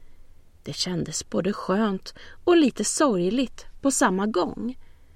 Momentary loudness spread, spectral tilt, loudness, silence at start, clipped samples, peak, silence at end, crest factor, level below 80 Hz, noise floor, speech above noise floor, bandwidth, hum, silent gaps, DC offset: 14 LU; -4 dB/octave; -24 LUFS; 0 s; under 0.1%; -6 dBFS; 0.25 s; 18 dB; -50 dBFS; -47 dBFS; 23 dB; 15 kHz; none; none; under 0.1%